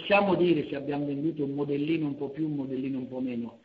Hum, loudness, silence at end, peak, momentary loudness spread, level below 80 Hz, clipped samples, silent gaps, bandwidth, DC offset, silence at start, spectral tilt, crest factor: none; -29 LUFS; 0.1 s; -10 dBFS; 9 LU; -66 dBFS; under 0.1%; none; 5.2 kHz; under 0.1%; 0 s; -9 dB/octave; 20 dB